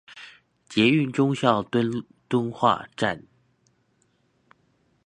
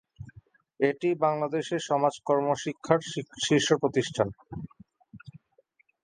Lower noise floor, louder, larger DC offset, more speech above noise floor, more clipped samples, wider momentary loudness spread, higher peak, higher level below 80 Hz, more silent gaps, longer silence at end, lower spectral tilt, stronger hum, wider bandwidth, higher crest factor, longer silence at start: about the same, -67 dBFS vs -67 dBFS; first, -24 LUFS vs -27 LUFS; neither; first, 45 dB vs 40 dB; neither; about the same, 17 LU vs 17 LU; first, -2 dBFS vs -6 dBFS; about the same, -64 dBFS vs -62 dBFS; neither; first, 1.9 s vs 0.65 s; first, -6 dB/octave vs -4.5 dB/octave; neither; about the same, 10 kHz vs 10 kHz; about the same, 24 dB vs 24 dB; about the same, 0.1 s vs 0.2 s